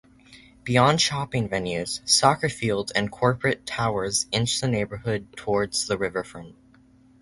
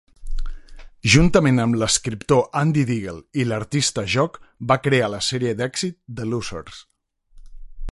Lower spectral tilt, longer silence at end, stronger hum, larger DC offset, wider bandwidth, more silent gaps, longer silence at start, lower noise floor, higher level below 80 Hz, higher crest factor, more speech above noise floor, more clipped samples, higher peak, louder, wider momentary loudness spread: about the same, -3.5 dB/octave vs -4.5 dB/octave; first, 0.7 s vs 0 s; neither; neither; about the same, 11.5 kHz vs 11.5 kHz; neither; about the same, 0.3 s vs 0.2 s; about the same, -55 dBFS vs -52 dBFS; second, -52 dBFS vs -36 dBFS; about the same, 22 dB vs 20 dB; about the same, 31 dB vs 32 dB; neither; about the same, -2 dBFS vs -2 dBFS; second, -24 LUFS vs -20 LUFS; second, 11 LU vs 19 LU